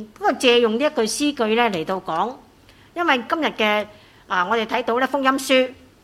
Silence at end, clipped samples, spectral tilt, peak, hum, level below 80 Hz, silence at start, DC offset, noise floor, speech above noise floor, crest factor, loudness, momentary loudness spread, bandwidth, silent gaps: 0.3 s; under 0.1%; -3 dB/octave; -2 dBFS; none; -60 dBFS; 0 s; under 0.1%; -50 dBFS; 30 dB; 18 dB; -20 LUFS; 8 LU; 15 kHz; none